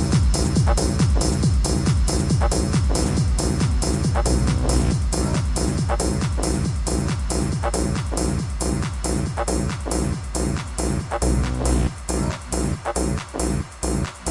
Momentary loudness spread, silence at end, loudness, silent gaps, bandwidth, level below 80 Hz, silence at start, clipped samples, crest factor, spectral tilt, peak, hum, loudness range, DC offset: 5 LU; 0 s; -22 LUFS; none; 11.5 kHz; -24 dBFS; 0 s; under 0.1%; 16 dB; -5.5 dB/octave; -4 dBFS; none; 4 LU; under 0.1%